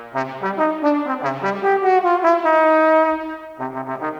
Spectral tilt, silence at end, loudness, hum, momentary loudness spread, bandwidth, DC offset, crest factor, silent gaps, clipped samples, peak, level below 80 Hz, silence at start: -6.5 dB/octave; 0 s; -18 LUFS; none; 13 LU; 7.6 kHz; under 0.1%; 16 dB; none; under 0.1%; -2 dBFS; -64 dBFS; 0 s